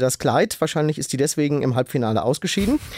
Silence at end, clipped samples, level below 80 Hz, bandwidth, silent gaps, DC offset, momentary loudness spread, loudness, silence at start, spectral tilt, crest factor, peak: 0 s; under 0.1%; -46 dBFS; 16 kHz; none; under 0.1%; 3 LU; -21 LUFS; 0 s; -5 dB/octave; 16 dB; -6 dBFS